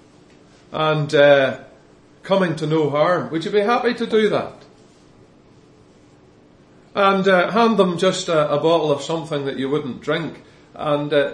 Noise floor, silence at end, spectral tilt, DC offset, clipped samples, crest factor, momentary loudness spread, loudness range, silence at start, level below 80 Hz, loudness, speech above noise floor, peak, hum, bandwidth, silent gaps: -50 dBFS; 0 s; -5.5 dB/octave; under 0.1%; under 0.1%; 18 dB; 10 LU; 5 LU; 0.7 s; -62 dBFS; -18 LUFS; 32 dB; -2 dBFS; none; 11 kHz; none